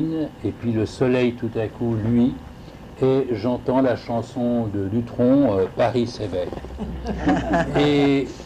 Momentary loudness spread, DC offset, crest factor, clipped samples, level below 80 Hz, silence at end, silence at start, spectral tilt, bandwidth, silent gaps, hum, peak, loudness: 11 LU; under 0.1%; 14 dB; under 0.1%; -40 dBFS; 0 s; 0 s; -7.5 dB/octave; 9.6 kHz; none; none; -8 dBFS; -22 LUFS